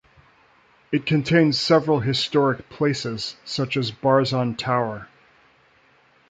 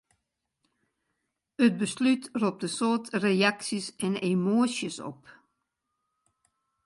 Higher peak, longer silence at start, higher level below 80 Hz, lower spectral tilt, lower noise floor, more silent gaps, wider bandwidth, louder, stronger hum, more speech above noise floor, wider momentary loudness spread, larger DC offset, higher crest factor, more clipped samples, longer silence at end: first, -4 dBFS vs -10 dBFS; second, 0.9 s vs 1.6 s; first, -58 dBFS vs -76 dBFS; about the same, -6 dB/octave vs -5 dB/octave; second, -58 dBFS vs -82 dBFS; neither; second, 9.2 kHz vs 11.5 kHz; first, -22 LUFS vs -27 LUFS; neither; second, 37 dB vs 55 dB; about the same, 10 LU vs 9 LU; neither; about the same, 18 dB vs 20 dB; neither; second, 1.25 s vs 1.55 s